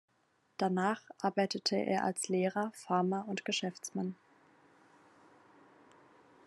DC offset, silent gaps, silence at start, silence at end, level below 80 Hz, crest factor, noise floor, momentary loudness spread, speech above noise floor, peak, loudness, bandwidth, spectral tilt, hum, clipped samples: under 0.1%; none; 0.6 s; 2.3 s; -86 dBFS; 20 dB; -74 dBFS; 7 LU; 40 dB; -18 dBFS; -34 LUFS; 12.5 kHz; -4.5 dB/octave; none; under 0.1%